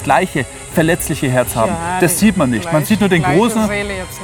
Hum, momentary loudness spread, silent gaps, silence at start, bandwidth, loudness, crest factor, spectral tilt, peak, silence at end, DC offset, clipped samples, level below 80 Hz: none; 7 LU; none; 0 s; 18 kHz; -15 LUFS; 14 dB; -5 dB/octave; 0 dBFS; 0 s; under 0.1%; under 0.1%; -36 dBFS